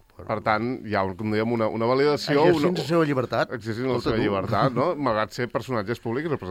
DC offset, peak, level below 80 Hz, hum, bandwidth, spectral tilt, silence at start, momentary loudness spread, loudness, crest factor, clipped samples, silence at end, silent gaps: under 0.1%; -6 dBFS; -54 dBFS; none; 15.5 kHz; -6.5 dB/octave; 0.2 s; 8 LU; -24 LUFS; 18 dB; under 0.1%; 0 s; none